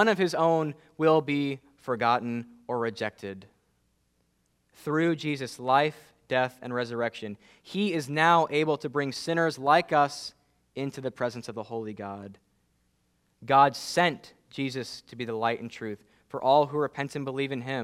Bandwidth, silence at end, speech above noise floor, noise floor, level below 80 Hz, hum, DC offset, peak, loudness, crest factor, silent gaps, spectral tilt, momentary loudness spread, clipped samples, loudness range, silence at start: 15 kHz; 0 s; 44 dB; -72 dBFS; -72 dBFS; none; under 0.1%; -6 dBFS; -27 LUFS; 22 dB; none; -5.5 dB/octave; 17 LU; under 0.1%; 7 LU; 0 s